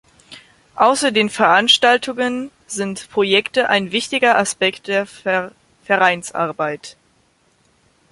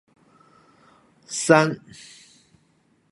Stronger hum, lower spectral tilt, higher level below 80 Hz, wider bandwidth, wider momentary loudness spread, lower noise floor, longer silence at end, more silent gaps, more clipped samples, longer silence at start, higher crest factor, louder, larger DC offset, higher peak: neither; second, -2.5 dB/octave vs -4.5 dB/octave; first, -62 dBFS vs -68 dBFS; about the same, 11.5 kHz vs 11.5 kHz; second, 12 LU vs 26 LU; second, -59 dBFS vs -64 dBFS; second, 1.2 s vs 1.35 s; neither; neither; second, 0.3 s vs 1.3 s; second, 18 dB vs 26 dB; first, -17 LUFS vs -20 LUFS; neither; about the same, 0 dBFS vs 0 dBFS